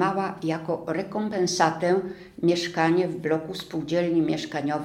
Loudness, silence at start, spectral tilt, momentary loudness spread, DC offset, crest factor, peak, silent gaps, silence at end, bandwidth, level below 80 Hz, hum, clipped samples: -25 LUFS; 0 s; -5 dB/octave; 7 LU; under 0.1%; 18 dB; -6 dBFS; none; 0 s; 13.5 kHz; -62 dBFS; none; under 0.1%